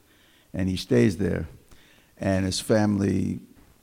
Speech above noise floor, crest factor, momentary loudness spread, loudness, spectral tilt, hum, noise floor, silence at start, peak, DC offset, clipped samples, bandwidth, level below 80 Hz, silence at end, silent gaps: 35 dB; 18 dB; 12 LU; -25 LUFS; -6 dB/octave; none; -58 dBFS; 0.55 s; -8 dBFS; under 0.1%; under 0.1%; 16 kHz; -54 dBFS; 0.35 s; none